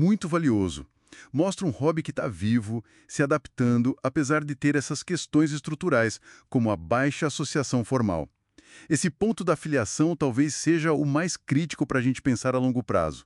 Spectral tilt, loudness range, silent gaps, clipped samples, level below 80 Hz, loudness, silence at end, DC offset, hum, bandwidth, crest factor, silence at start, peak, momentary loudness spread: -5.5 dB/octave; 2 LU; none; under 0.1%; -54 dBFS; -26 LUFS; 0.05 s; under 0.1%; none; 12 kHz; 16 dB; 0 s; -10 dBFS; 6 LU